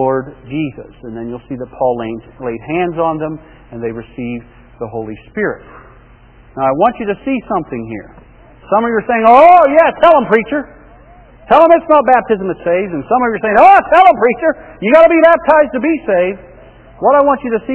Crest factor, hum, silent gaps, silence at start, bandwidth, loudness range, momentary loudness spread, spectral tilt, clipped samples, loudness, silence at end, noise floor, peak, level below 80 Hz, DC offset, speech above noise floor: 12 dB; none; none; 0 s; 4 kHz; 12 LU; 19 LU; -9.5 dB/octave; 0.5%; -11 LUFS; 0 s; -42 dBFS; 0 dBFS; -44 dBFS; under 0.1%; 30 dB